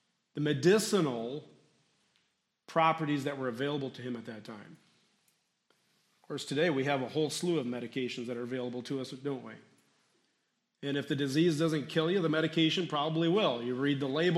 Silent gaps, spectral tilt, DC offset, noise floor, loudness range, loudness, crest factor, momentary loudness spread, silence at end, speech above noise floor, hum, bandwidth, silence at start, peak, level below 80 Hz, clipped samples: none; -5.5 dB/octave; under 0.1%; -79 dBFS; 9 LU; -32 LUFS; 20 dB; 13 LU; 0 s; 48 dB; none; 14 kHz; 0.35 s; -14 dBFS; -80 dBFS; under 0.1%